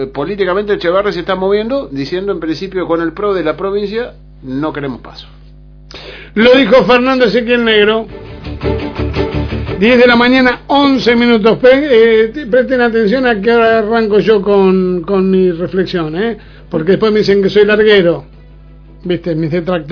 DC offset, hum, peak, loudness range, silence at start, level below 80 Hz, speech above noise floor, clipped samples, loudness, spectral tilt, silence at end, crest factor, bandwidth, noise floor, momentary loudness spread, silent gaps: under 0.1%; none; 0 dBFS; 8 LU; 0 s; -34 dBFS; 25 dB; 0.3%; -11 LUFS; -7 dB/octave; 0 s; 12 dB; 5.4 kHz; -36 dBFS; 12 LU; none